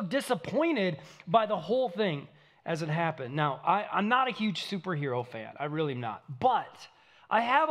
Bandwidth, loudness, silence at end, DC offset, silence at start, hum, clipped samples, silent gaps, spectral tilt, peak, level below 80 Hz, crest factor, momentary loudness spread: 14.5 kHz; -30 LUFS; 0 s; under 0.1%; 0 s; none; under 0.1%; none; -6 dB/octave; -10 dBFS; -76 dBFS; 20 dB; 10 LU